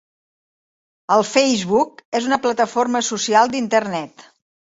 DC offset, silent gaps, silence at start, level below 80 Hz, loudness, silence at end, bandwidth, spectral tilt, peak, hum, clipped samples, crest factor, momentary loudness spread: under 0.1%; 2.05-2.12 s; 1.1 s; -64 dBFS; -18 LUFS; 0.7 s; 8 kHz; -3 dB/octave; -2 dBFS; none; under 0.1%; 18 dB; 10 LU